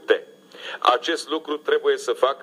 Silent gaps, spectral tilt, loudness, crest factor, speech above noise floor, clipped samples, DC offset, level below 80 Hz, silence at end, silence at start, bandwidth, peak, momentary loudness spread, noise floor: none; -1.5 dB/octave; -22 LUFS; 20 dB; 19 dB; under 0.1%; under 0.1%; -88 dBFS; 0 s; 0.05 s; 13 kHz; -2 dBFS; 8 LU; -41 dBFS